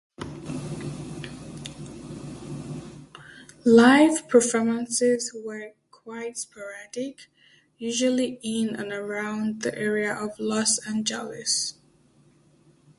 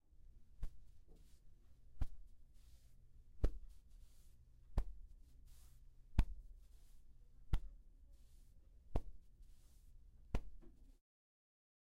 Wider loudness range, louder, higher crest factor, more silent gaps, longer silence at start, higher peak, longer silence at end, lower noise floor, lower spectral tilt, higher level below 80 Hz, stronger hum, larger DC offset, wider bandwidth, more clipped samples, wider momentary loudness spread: first, 9 LU vs 6 LU; first, -24 LUFS vs -49 LUFS; second, 22 dB vs 28 dB; neither; about the same, 0.2 s vs 0.2 s; first, -4 dBFS vs -18 dBFS; first, 1.25 s vs 1.05 s; second, -59 dBFS vs -63 dBFS; second, -3.5 dB/octave vs -7.5 dB/octave; second, -60 dBFS vs -48 dBFS; neither; neither; about the same, 11.5 kHz vs 10.5 kHz; neither; second, 20 LU vs 23 LU